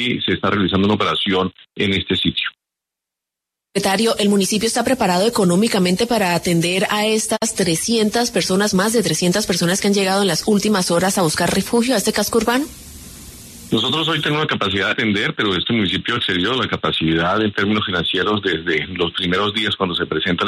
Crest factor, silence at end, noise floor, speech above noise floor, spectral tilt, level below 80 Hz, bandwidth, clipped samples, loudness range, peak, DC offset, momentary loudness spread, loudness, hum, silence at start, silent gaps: 14 dB; 0 s; -84 dBFS; 66 dB; -4 dB/octave; -48 dBFS; 13.5 kHz; under 0.1%; 3 LU; -4 dBFS; under 0.1%; 4 LU; -17 LUFS; none; 0 s; none